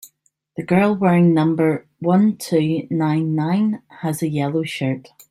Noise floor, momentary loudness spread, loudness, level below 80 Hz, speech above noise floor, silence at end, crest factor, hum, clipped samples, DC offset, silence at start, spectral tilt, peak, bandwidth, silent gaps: -61 dBFS; 10 LU; -19 LUFS; -60 dBFS; 43 dB; 0.3 s; 16 dB; none; under 0.1%; under 0.1%; 0.05 s; -7.5 dB/octave; -2 dBFS; 15 kHz; none